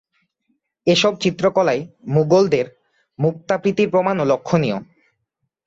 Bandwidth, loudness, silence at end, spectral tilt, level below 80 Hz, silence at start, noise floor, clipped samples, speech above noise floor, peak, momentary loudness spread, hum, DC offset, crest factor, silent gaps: 7.8 kHz; -18 LUFS; 0.85 s; -6 dB/octave; -58 dBFS; 0.85 s; -75 dBFS; under 0.1%; 57 dB; -4 dBFS; 8 LU; none; under 0.1%; 16 dB; none